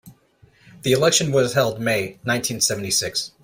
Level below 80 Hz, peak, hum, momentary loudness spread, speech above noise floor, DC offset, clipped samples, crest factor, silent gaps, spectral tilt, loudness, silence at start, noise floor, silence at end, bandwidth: -56 dBFS; -4 dBFS; none; 7 LU; 35 dB; under 0.1%; under 0.1%; 18 dB; none; -3 dB/octave; -20 LUFS; 0.05 s; -56 dBFS; 0.15 s; 16 kHz